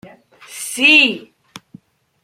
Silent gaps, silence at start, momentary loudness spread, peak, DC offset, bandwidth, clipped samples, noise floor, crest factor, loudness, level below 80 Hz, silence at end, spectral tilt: none; 0.05 s; 22 LU; 0 dBFS; under 0.1%; 16.5 kHz; under 0.1%; -46 dBFS; 18 dB; -11 LUFS; -70 dBFS; 1.05 s; -1 dB/octave